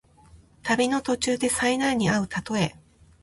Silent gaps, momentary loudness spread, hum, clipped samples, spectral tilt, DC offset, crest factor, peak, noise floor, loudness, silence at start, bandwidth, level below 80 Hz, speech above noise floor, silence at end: none; 5 LU; none; under 0.1%; -4 dB/octave; under 0.1%; 16 dB; -10 dBFS; -53 dBFS; -24 LUFS; 0.65 s; 11.5 kHz; -54 dBFS; 29 dB; 0.5 s